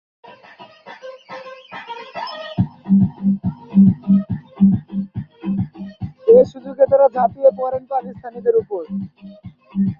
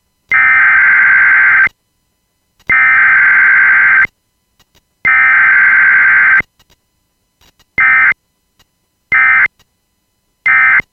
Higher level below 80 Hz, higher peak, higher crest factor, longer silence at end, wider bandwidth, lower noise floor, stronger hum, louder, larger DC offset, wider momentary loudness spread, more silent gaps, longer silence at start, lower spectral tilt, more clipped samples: about the same, -46 dBFS vs -48 dBFS; about the same, -2 dBFS vs 0 dBFS; first, 16 dB vs 10 dB; about the same, 0.05 s vs 0.1 s; second, 5.6 kHz vs 6.2 kHz; second, -43 dBFS vs -63 dBFS; neither; second, -18 LUFS vs -7 LUFS; neither; first, 21 LU vs 8 LU; neither; first, 0.6 s vs 0.3 s; first, -10.5 dB/octave vs -3.5 dB/octave; neither